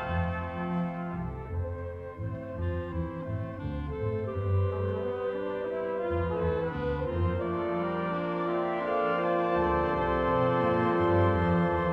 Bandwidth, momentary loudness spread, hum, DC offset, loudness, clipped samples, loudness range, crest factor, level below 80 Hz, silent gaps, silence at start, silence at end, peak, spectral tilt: 5.6 kHz; 10 LU; none; under 0.1%; -30 LUFS; under 0.1%; 8 LU; 16 dB; -46 dBFS; none; 0 s; 0 s; -14 dBFS; -9.5 dB/octave